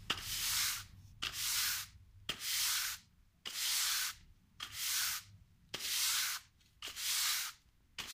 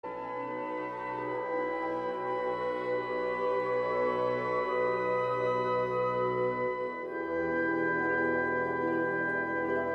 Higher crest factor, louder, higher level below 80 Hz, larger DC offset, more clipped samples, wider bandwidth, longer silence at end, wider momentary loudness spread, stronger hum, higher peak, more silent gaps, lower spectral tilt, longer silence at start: first, 20 dB vs 14 dB; second, -36 LUFS vs -31 LUFS; about the same, -64 dBFS vs -66 dBFS; neither; neither; first, 16 kHz vs 6.4 kHz; about the same, 0 s vs 0 s; first, 15 LU vs 7 LU; neither; about the same, -20 dBFS vs -18 dBFS; neither; second, 1.5 dB/octave vs -7.5 dB/octave; about the same, 0 s vs 0.05 s